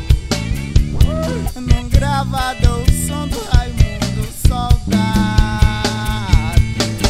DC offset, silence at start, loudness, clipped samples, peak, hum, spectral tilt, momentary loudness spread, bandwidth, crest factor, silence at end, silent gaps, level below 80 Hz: under 0.1%; 0 s; -17 LUFS; 0.2%; 0 dBFS; none; -5.5 dB/octave; 5 LU; 16 kHz; 14 dB; 0 s; none; -18 dBFS